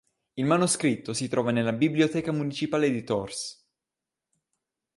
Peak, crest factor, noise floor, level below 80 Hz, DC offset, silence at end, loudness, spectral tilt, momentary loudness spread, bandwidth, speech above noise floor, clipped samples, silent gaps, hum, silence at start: -10 dBFS; 18 dB; -88 dBFS; -64 dBFS; under 0.1%; 1.45 s; -26 LUFS; -5 dB/octave; 10 LU; 11.5 kHz; 63 dB; under 0.1%; none; none; 0.35 s